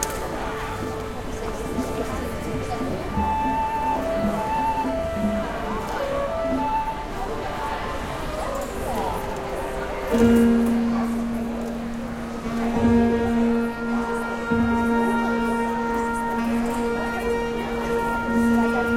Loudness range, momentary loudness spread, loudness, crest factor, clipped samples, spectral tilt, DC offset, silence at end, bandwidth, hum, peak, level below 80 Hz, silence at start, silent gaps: 5 LU; 9 LU; -24 LUFS; 20 dB; under 0.1%; -6 dB/octave; under 0.1%; 0 s; 16 kHz; none; -4 dBFS; -38 dBFS; 0 s; none